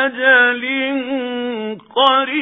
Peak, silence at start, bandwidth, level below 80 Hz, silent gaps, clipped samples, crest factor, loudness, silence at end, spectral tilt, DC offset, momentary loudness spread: 0 dBFS; 0 s; 4.2 kHz; -68 dBFS; none; under 0.1%; 16 dB; -15 LUFS; 0 s; -5 dB/octave; under 0.1%; 12 LU